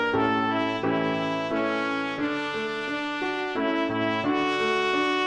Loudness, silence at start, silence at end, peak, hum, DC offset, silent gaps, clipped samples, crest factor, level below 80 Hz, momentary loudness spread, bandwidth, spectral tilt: -26 LUFS; 0 s; 0 s; -10 dBFS; none; under 0.1%; none; under 0.1%; 14 dB; -60 dBFS; 5 LU; 9.6 kHz; -5 dB/octave